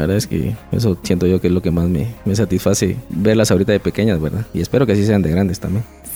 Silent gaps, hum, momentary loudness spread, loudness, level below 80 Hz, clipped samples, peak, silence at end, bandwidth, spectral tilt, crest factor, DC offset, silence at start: none; none; 7 LU; -17 LUFS; -36 dBFS; under 0.1%; -2 dBFS; 0 s; over 20 kHz; -6.5 dB/octave; 14 dB; under 0.1%; 0 s